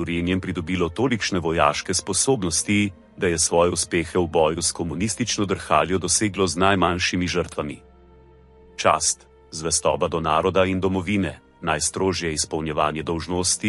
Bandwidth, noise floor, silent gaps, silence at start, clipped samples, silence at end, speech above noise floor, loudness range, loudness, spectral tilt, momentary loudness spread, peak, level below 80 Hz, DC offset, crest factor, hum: 11.5 kHz; -50 dBFS; none; 0 s; under 0.1%; 0 s; 28 dB; 2 LU; -22 LUFS; -3.5 dB/octave; 7 LU; -2 dBFS; -46 dBFS; under 0.1%; 20 dB; none